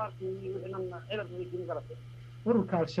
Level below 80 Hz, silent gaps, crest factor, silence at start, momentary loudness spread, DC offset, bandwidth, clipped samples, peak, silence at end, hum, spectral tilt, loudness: -62 dBFS; none; 20 dB; 0 s; 14 LU; under 0.1%; 10 kHz; under 0.1%; -14 dBFS; 0 s; none; -8 dB/octave; -35 LUFS